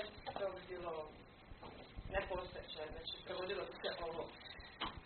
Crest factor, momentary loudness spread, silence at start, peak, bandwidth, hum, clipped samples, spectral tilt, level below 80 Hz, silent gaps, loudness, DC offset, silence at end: 22 dB; 11 LU; 0 s; -26 dBFS; 4.5 kHz; none; under 0.1%; -2 dB/octave; -60 dBFS; none; -46 LUFS; under 0.1%; 0 s